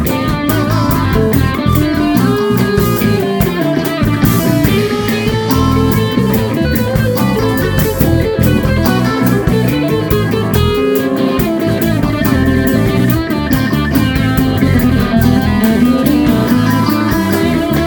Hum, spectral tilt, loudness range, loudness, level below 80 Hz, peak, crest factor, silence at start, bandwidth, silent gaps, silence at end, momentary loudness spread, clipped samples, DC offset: none; -6.5 dB/octave; 1 LU; -12 LUFS; -24 dBFS; 0 dBFS; 12 dB; 0 s; over 20 kHz; none; 0 s; 3 LU; under 0.1%; under 0.1%